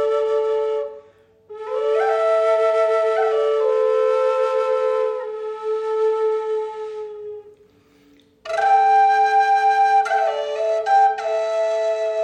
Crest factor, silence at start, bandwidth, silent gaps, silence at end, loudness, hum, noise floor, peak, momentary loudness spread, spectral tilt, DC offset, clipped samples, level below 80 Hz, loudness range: 12 dB; 0 s; 9.4 kHz; none; 0 s; -19 LUFS; none; -54 dBFS; -6 dBFS; 13 LU; -1.5 dB/octave; under 0.1%; under 0.1%; -72 dBFS; 7 LU